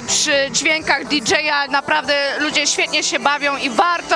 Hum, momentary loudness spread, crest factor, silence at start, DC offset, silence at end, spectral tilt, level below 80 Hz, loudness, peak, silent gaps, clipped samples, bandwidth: none; 2 LU; 16 dB; 0 s; under 0.1%; 0 s; -1 dB/octave; -54 dBFS; -16 LUFS; 0 dBFS; none; under 0.1%; 10.5 kHz